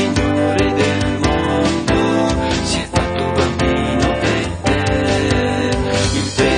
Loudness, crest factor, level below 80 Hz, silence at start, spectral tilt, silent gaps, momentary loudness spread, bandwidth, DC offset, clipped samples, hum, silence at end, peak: -16 LUFS; 14 dB; -28 dBFS; 0 s; -5 dB/octave; none; 2 LU; 10.5 kHz; under 0.1%; under 0.1%; none; 0 s; -2 dBFS